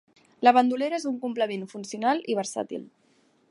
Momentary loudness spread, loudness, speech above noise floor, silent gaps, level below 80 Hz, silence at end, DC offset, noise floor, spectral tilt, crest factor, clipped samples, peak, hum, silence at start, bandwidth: 15 LU; -26 LUFS; 39 dB; none; -82 dBFS; 0.65 s; under 0.1%; -64 dBFS; -4 dB/octave; 22 dB; under 0.1%; -4 dBFS; none; 0.4 s; 11.5 kHz